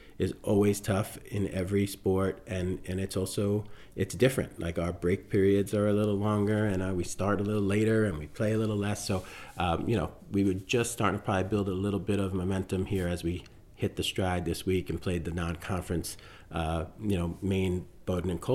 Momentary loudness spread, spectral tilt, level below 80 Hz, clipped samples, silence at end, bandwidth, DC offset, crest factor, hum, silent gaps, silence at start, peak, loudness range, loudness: 8 LU; -6 dB/octave; -52 dBFS; under 0.1%; 0 s; 16 kHz; under 0.1%; 18 dB; none; none; 0 s; -12 dBFS; 4 LU; -30 LUFS